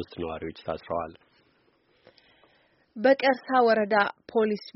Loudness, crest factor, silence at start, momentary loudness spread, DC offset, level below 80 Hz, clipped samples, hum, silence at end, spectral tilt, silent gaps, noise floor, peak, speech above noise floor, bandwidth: -26 LUFS; 20 dB; 0 s; 14 LU; under 0.1%; -62 dBFS; under 0.1%; none; 0.05 s; -3 dB/octave; none; -66 dBFS; -8 dBFS; 40 dB; 6 kHz